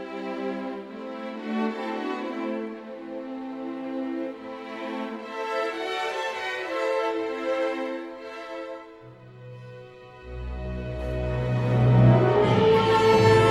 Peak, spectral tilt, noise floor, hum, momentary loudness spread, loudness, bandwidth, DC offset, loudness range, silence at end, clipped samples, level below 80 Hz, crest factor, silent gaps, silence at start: -6 dBFS; -7 dB/octave; -46 dBFS; none; 20 LU; -25 LUFS; 11.5 kHz; under 0.1%; 12 LU; 0 s; under 0.1%; -44 dBFS; 20 dB; none; 0 s